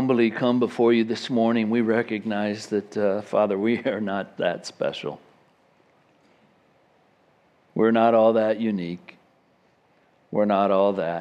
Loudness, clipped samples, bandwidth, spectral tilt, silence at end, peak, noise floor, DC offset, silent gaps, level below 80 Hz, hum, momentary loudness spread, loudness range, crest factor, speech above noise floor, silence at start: -23 LUFS; under 0.1%; 9.8 kHz; -6.5 dB/octave; 0 s; -6 dBFS; -62 dBFS; under 0.1%; none; -76 dBFS; none; 10 LU; 9 LU; 18 dB; 40 dB; 0 s